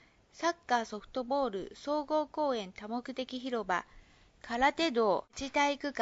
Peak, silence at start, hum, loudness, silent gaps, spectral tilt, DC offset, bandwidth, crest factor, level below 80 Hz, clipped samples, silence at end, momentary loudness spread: -14 dBFS; 0.35 s; none; -33 LUFS; none; -1.5 dB/octave; under 0.1%; 7.6 kHz; 18 dB; -62 dBFS; under 0.1%; 0 s; 10 LU